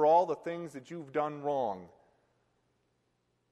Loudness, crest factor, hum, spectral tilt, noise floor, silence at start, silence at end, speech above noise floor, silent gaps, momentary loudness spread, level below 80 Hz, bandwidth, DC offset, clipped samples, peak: -33 LUFS; 20 dB; none; -6.5 dB/octave; -77 dBFS; 0 s; 1.65 s; 45 dB; none; 16 LU; -80 dBFS; 11.5 kHz; under 0.1%; under 0.1%; -14 dBFS